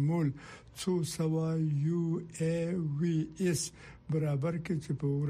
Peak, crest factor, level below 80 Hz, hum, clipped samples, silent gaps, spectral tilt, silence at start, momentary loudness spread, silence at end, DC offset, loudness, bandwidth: -20 dBFS; 12 dB; -62 dBFS; none; under 0.1%; none; -6.5 dB/octave; 0 s; 6 LU; 0 s; under 0.1%; -33 LUFS; 15.5 kHz